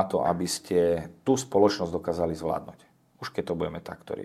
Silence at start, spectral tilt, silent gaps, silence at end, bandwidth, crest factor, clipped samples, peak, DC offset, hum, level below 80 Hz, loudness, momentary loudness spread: 0 s; -5 dB/octave; none; 0 s; 15 kHz; 20 dB; under 0.1%; -8 dBFS; under 0.1%; none; -60 dBFS; -27 LUFS; 13 LU